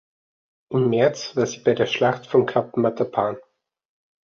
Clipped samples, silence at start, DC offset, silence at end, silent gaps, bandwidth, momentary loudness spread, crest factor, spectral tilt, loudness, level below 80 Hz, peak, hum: under 0.1%; 0.7 s; under 0.1%; 0.85 s; none; 7.4 kHz; 6 LU; 18 dB; -6 dB/octave; -22 LUFS; -62 dBFS; -6 dBFS; none